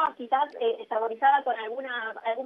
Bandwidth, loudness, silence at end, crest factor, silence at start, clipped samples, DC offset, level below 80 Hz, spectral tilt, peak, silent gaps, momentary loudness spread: 5 kHz; -27 LUFS; 0 s; 16 dB; 0 s; under 0.1%; under 0.1%; -86 dBFS; -4.5 dB/octave; -10 dBFS; none; 9 LU